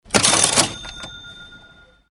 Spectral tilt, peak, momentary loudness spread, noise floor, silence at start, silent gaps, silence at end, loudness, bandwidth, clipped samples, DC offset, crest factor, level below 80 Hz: -1 dB/octave; 0 dBFS; 23 LU; -49 dBFS; 0.1 s; none; 0.55 s; -15 LUFS; over 20 kHz; under 0.1%; under 0.1%; 22 dB; -48 dBFS